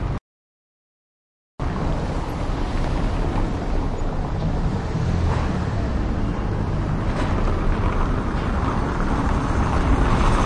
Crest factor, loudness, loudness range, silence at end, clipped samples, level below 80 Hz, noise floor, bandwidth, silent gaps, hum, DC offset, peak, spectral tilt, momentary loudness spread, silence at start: 16 dB; -24 LUFS; 4 LU; 0 s; under 0.1%; -24 dBFS; under -90 dBFS; 10.5 kHz; 0.21-1.58 s; none; under 0.1%; -6 dBFS; -7 dB/octave; 6 LU; 0 s